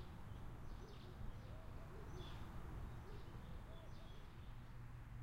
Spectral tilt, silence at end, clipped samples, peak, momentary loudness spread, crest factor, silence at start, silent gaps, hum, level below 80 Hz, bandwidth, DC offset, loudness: -6.5 dB/octave; 0 s; under 0.1%; -38 dBFS; 4 LU; 14 dB; 0 s; none; none; -56 dBFS; 16 kHz; under 0.1%; -56 LUFS